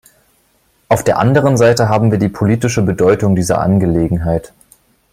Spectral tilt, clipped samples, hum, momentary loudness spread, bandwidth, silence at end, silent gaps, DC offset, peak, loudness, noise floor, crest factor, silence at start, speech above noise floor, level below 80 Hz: -6.5 dB/octave; under 0.1%; none; 5 LU; 16 kHz; 0.65 s; none; under 0.1%; 0 dBFS; -13 LUFS; -57 dBFS; 14 dB; 0.9 s; 45 dB; -38 dBFS